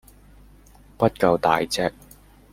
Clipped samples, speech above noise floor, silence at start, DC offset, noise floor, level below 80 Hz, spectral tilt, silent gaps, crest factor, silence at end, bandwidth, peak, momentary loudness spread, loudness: under 0.1%; 30 dB; 1 s; under 0.1%; -50 dBFS; -50 dBFS; -5 dB/octave; none; 22 dB; 0.6 s; 16.5 kHz; -2 dBFS; 6 LU; -22 LUFS